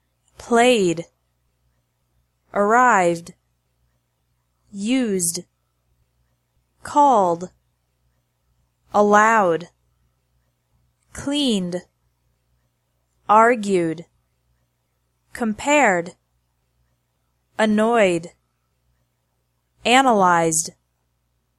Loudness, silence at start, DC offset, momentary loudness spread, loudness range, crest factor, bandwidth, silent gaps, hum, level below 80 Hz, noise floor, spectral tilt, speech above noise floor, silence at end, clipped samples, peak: -18 LUFS; 0.4 s; under 0.1%; 17 LU; 6 LU; 22 dB; 14 kHz; none; 60 Hz at -55 dBFS; -60 dBFS; -70 dBFS; -3.5 dB/octave; 53 dB; 0.9 s; under 0.1%; 0 dBFS